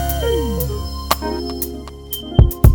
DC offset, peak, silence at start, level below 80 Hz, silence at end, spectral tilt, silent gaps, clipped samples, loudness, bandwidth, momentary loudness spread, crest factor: under 0.1%; 0 dBFS; 0 s; -20 dBFS; 0 s; -6 dB/octave; none; under 0.1%; -20 LUFS; over 20 kHz; 11 LU; 16 dB